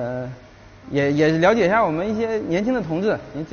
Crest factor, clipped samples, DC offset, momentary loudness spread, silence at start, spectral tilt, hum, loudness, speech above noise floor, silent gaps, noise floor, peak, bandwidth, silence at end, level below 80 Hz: 18 dB; under 0.1%; under 0.1%; 11 LU; 0 s; -5.5 dB/octave; none; -20 LUFS; 25 dB; none; -45 dBFS; -4 dBFS; 7 kHz; 0 s; -48 dBFS